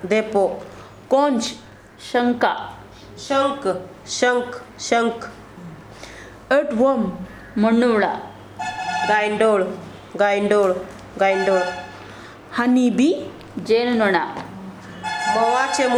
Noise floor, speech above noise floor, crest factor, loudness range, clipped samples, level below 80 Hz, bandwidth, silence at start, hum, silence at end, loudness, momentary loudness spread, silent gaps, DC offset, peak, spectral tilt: -39 dBFS; 20 dB; 18 dB; 3 LU; under 0.1%; -54 dBFS; 12.5 kHz; 0 s; none; 0 s; -20 LUFS; 21 LU; none; under 0.1%; -2 dBFS; -4.5 dB/octave